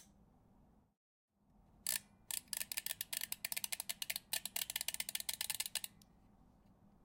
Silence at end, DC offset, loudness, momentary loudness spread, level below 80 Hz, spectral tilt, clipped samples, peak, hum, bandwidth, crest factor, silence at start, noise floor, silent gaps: 0.6 s; under 0.1%; -41 LUFS; 4 LU; -74 dBFS; 1.5 dB/octave; under 0.1%; -18 dBFS; none; 17 kHz; 28 dB; 0 s; -70 dBFS; 0.97-1.28 s